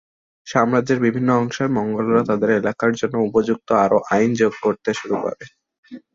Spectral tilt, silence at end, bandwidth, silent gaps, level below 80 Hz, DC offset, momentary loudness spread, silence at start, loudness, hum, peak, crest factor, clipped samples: -6.5 dB/octave; 0.15 s; 7.6 kHz; 5.78-5.83 s; -58 dBFS; under 0.1%; 6 LU; 0.45 s; -19 LUFS; none; -2 dBFS; 16 dB; under 0.1%